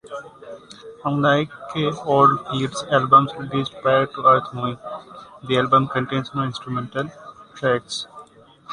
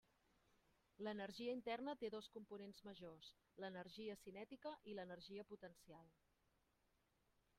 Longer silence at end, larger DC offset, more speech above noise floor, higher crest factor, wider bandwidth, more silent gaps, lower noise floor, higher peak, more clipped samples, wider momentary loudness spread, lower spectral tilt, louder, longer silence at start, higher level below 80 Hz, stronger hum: second, 0 s vs 1.5 s; neither; second, 26 dB vs 31 dB; about the same, 20 dB vs 18 dB; second, 10.5 kHz vs 14.5 kHz; neither; second, -47 dBFS vs -84 dBFS; first, -2 dBFS vs -36 dBFS; neither; first, 21 LU vs 13 LU; about the same, -6 dB/octave vs -5.5 dB/octave; first, -20 LUFS vs -54 LUFS; second, 0.05 s vs 1 s; first, -58 dBFS vs -86 dBFS; neither